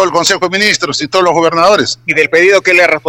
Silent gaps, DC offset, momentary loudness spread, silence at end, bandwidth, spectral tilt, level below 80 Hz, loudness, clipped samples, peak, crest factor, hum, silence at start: none; under 0.1%; 5 LU; 0 s; 17 kHz; -2.5 dB/octave; -50 dBFS; -9 LUFS; 0.5%; 0 dBFS; 10 dB; none; 0 s